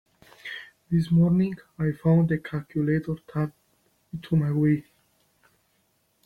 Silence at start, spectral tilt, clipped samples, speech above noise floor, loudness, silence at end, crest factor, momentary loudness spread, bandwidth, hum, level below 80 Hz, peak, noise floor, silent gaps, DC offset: 0.45 s; -9.5 dB/octave; under 0.1%; 45 dB; -25 LUFS; 1.45 s; 16 dB; 17 LU; 4.7 kHz; none; -54 dBFS; -10 dBFS; -69 dBFS; none; under 0.1%